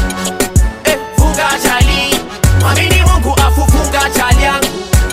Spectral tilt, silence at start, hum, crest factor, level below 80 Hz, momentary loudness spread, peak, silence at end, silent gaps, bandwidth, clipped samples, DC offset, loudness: -4 dB/octave; 0 s; none; 10 dB; -14 dBFS; 4 LU; 0 dBFS; 0 s; none; 16.5 kHz; under 0.1%; under 0.1%; -11 LUFS